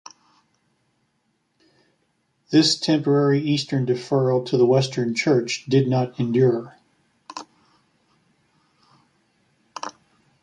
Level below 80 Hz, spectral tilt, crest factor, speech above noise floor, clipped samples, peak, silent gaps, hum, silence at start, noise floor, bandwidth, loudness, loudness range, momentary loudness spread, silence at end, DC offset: -66 dBFS; -6 dB/octave; 18 dB; 50 dB; under 0.1%; -6 dBFS; none; none; 2.5 s; -70 dBFS; 11.5 kHz; -20 LUFS; 8 LU; 20 LU; 0.5 s; under 0.1%